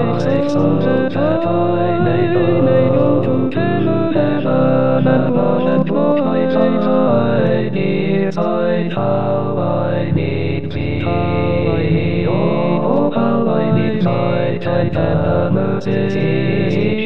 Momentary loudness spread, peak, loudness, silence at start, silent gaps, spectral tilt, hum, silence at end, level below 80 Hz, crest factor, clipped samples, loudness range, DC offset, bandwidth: 4 LU; -2 dBFS; -16 LUFS; 0 s; none; -9.5 dB/octave; none; 0 s; -44 dBFS; 14 dB; under 0.1%; 3 LU; 5%; 6.4 kHz